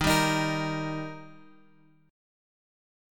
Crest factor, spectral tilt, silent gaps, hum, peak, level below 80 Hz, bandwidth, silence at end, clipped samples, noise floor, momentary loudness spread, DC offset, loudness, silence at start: 22 dB; -4.5 dB/octave; none; none; -10 dBFS; -50 dBFS; 17.5 kHz; 1.75 s; under 0.1%; -61 dBFS; 17 LU; under 0.1%; -28 LUFS; 0 s